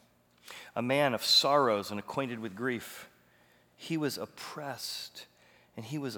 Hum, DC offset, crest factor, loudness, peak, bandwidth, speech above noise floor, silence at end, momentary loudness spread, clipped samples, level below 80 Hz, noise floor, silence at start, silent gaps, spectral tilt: none; under 0.1%; 22 dB; -31 LUFS; -12 dBFS; over 20 kHz; 33 dB; 0 s; 24 LU; under 0.1%; -80 dBFS; -65 dBFS; 0.45 s; none; -3.5 dB/octave